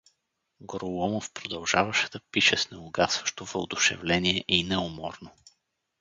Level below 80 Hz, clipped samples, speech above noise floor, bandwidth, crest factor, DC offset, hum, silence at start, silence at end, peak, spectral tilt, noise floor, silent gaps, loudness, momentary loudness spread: -54 dBFS; under 0.1%; 49 dB; 9.6 kHz; 24 dB; under 0.1%; none; 0.6 s; 0.7 s; -4 dBFS; -2.5 dB/octave; -78 dBFS; none; -26 LUFS; 13 LU